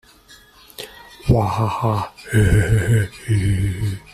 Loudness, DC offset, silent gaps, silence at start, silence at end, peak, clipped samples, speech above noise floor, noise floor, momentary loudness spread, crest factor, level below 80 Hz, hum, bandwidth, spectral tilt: -19 LUFS; under 0.1%; none; 0.8 s; 0.15 s; -2 dBFS; under 0.1%; 30 dB; -48 dBFS; 18 LU; 16 dB; -32 dBFS; none; 14.5 kHz; -6.5 dB/octave